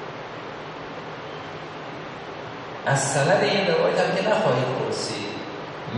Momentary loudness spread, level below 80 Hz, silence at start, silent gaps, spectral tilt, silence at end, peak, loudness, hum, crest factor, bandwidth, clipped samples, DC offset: 15 LU; -62 dBFS; 0 s; none; -4 dB/octave; 0 s; -8 dBFS; -25 LUFS; none; 18 dB; 10 kHz; under 0.1%; under 0.1%